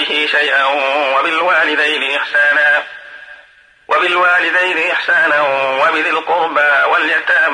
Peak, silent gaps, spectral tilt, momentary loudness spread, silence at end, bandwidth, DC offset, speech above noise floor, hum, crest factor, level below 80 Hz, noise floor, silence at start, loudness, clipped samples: -4 dBFS; none; -2 dB/octave; 4 LU; 0 s; 10.5 kHz; under 0.1%; 33 dB; none; 10 dB; -66 dBFS; -46 dBFS; 0 s; -12 LUFS; under 0.1%